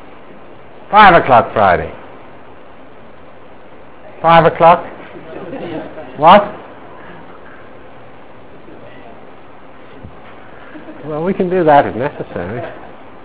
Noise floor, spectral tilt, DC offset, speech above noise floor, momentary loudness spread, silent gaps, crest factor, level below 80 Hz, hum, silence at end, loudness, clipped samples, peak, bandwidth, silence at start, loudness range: -39 dBFS; -9.5 dB/octave; 2%; 29 dB; 27 LU; none; 16 dB; -42 dBFS; none; 0.45 s; -11 LUFS; 0.7%; 0 dBFS; 4 kHz; 0.9 s; 6 LU